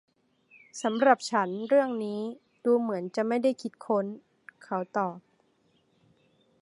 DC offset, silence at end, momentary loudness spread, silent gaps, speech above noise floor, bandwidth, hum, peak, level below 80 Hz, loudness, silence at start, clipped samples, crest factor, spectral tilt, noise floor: under 0.1%; 1.4 s; 14 LU; none; 41 dB; 11.5 kHz; none; -6 dBFS; -82 dBFS; -28 LUFS; 0.75 s; under 0.1%; 24 dB; -5 dB/octave; -69 dBFS